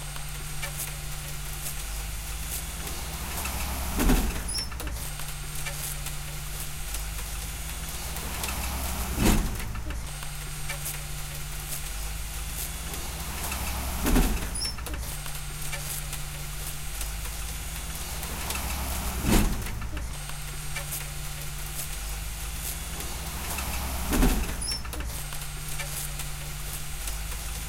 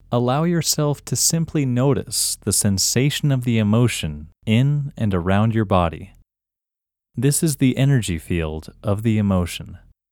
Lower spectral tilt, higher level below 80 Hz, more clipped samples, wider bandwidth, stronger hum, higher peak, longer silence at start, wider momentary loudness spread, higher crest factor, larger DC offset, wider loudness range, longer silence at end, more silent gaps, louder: second, -3.5 dB/octave vs -5 dB/octave; first, -34 dBFS vs -42 dBFS; neither; second, 17 kHz vs 19 kHz; neither; second, -8 dBFS vs -2 dBFS; about the same, 0 s vs 0.1 s; about the same, 10 LU vs 9 LU; about the same, 22 dB vs 18 dB; neither; about the same, 4 LU vs 3 LU; second, 0 s vs 0.35 s; neither; second, -32 LUFS vs -20 LUFS